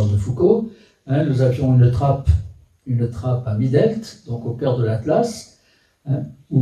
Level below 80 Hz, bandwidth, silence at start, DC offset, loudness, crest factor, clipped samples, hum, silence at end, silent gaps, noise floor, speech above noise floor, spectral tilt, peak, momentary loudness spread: -34 dBFS; 10 kHz; 0 s; under 0.1%; -19 LUFS; 16 dB; under 0.1%; none; 0 s; none; -59 dBFS; 41 dB; -8.5 dB/octave; -2 dBFS; 14 LU